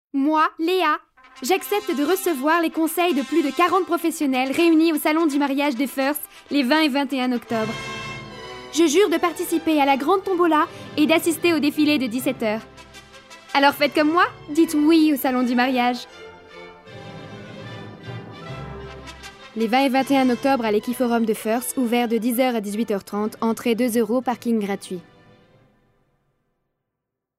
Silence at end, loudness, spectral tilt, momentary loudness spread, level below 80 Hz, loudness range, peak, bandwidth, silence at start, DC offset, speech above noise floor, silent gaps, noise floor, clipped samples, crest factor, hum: 2.35 s; -21 LUFS; -4 dB/octave; 18 LU; -58 dBFS; 7 LU; -2 dBFS; 16 kHz; 0.15 s; under 0.1%; 62 dB; none; -82 dBFS; under 0.1%; 18 dB; none